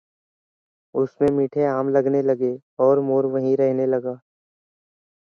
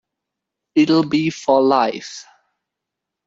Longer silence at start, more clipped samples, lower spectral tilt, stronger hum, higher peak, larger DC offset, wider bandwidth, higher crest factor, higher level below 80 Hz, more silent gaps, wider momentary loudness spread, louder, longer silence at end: first, 0.95 s vs 0.75 s; neither; first, -10 dB/octave vs -5.5 dB/octave; neither; second, -6 dBFS vs -2 dBFS; neither; second, 6.6 kHz vs 7.8 kHz; about the same, 16 dB vs 16 dB; about the same, -62 dBFS vs -64 dBFS; first, 2.62-2.77 s vs none; second, 7 LU vs 17 LU; second, -21 LUFS vs -17 LUFS; about the same, 1.05 s vs 1.05 s